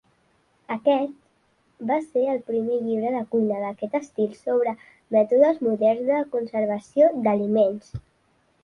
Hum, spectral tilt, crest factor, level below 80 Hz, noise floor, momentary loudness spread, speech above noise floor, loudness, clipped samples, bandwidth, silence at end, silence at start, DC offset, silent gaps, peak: none; -7.5 dB/octave; 18 dB; -60 dBFS; -65 dBFS; 10 LU; 43 dB; -23 LUFS; under 0.1%; 10.5 kHz; 0.65 s; 0.7 s; under 0.1%; none; -6 dBFS